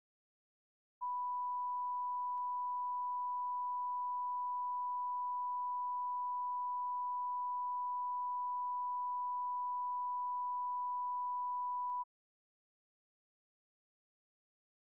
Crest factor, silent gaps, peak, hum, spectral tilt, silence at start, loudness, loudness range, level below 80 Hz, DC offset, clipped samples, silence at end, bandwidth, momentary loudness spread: 4 dB; none; -36 dBFS; none; 3.5 dB/octave; 1 s; -39 LUFS; 3 LU; under -90 dBFS; under 0.1%; under 0.1%; 2.8 s; 1.1 kHz; 0 LU